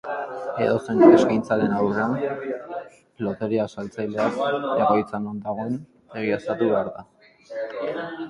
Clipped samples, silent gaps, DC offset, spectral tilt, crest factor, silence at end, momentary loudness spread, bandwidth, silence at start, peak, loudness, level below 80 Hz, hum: under 0.1%; none; under 0.1%; -7 dB/octave; 22 dB; 0 s; 15 LU; 10.5 kHz; 0.05 s; -2 dBFS; -23 LUFS; -60 dBFS; none